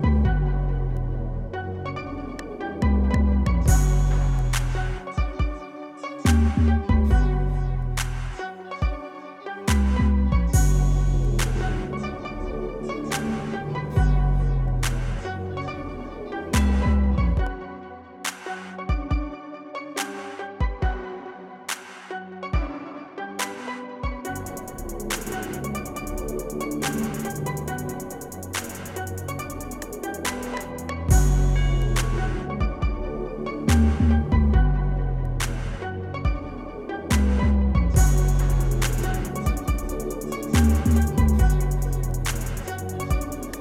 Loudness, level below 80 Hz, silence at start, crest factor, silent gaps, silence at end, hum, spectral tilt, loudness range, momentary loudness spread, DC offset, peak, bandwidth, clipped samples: -25 LUFS; -26 dBFS; 0 s; 18 dB; none; 0 s; none; -6 dB/octave; 8 LU; 13 LU; under 0.1%; -6 dBFS; 16 kHz; under 0.1%